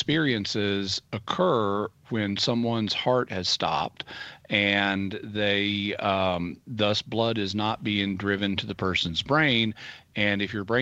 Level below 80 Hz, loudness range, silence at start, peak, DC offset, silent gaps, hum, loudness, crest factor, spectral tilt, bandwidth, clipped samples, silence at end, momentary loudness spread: -58 dBFS; 1 LU; 0 s; -6 dBFS; under 0.1%; none; none; -26 LUFS; 20 dB; -5 dB/octave; 8.4 kHz; under 0.1%; 0 s; 9 LU